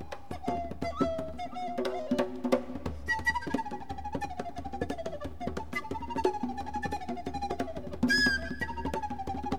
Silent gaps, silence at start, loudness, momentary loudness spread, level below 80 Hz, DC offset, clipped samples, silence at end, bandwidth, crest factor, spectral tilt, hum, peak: none; 0 s; -33 LUFS; 10 LU; -48 dBFS; 0.7%; under 0.1%; 0 s; 17 kHz; 20 dB; -5 dB/octave; none; -12 dBFS